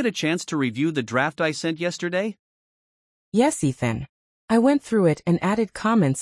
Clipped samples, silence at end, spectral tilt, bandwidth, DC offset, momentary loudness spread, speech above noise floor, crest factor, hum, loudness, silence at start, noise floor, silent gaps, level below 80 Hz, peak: under 0.1%; 0 s; -5.5 dB/octave; 12 kHz; under 0.1%; 7 LU; over 68 dB; 16 dB; none; -23 LUFS; 0 s; under -90 dBFS; 2.39-3.32 s, 4.09-4.48 s; -58 dBFS; -6 dBFS